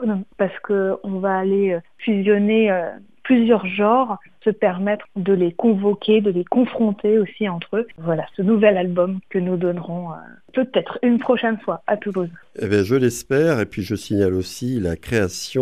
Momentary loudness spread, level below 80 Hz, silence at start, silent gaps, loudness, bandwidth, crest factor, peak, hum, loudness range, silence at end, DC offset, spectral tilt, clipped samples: 9 LU; -52 dBFS; 0 s; none; -20 LUFS; 14.5 kHz; 18 dB; 0 dBFS; none; 3 LU; 0 s; 0.3%; -6.5 dB/octave; under 0.1%